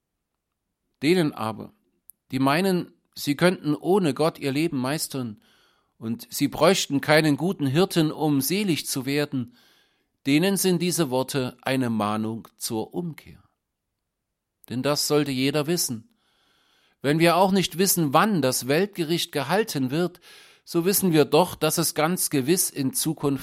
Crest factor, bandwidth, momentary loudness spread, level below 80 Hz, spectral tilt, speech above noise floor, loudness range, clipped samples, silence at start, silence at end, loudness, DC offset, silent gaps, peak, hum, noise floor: 22 dB; 16.5 kHz; 12 LU; -62 dBFS; -4.5 dB/octave; 58 dB; 5 LU; under 0.1%; 1 s; 0 s; -23 LUFS; under 0.1%; none; -2 dBFS; none; -81 dBFS